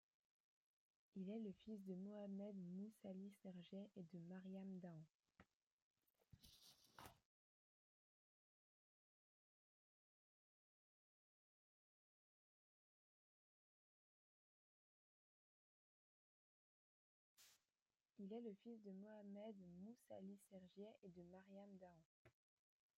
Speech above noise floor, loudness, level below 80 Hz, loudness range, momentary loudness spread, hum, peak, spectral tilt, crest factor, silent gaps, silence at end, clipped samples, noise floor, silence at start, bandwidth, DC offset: over 32 dB; -59 LUFS; under -90 dBFS; 7 LU; 11 LU; none; -40 dBFS; -7.5 dB/octave; 22 dB; 5.15-5.20 s, 5.55-5.60 s, 5.67-5.94 s, 7.25-17.37 s, 17.82-17.86 s, 20.98-21.02 s, 22.05-22.25 s; 0.7 s; under 0.1%; under -90 dBFS; 1.15 s; 14.5 kHz; under 0.1%